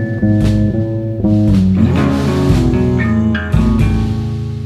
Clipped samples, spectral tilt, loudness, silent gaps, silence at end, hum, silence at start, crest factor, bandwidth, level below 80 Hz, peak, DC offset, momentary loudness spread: under 0.1%; -8.5 dB/octave; -14 LUFS; none; 0 s; none; 0 s; 12 dB; 12 kHz; -22 dBFS; 0 dBFS; under 0.1%; 6 LU